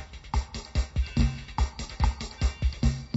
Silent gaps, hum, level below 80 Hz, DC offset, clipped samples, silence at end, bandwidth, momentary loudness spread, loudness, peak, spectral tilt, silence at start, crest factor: none; none; -30 dBFS; under 0.1%; under 0.1%; 0 s; 8 kHz; 5 LU; -30 LUFS; -10 dBFS; -5.5 dB/octave; 0 s; 18 dB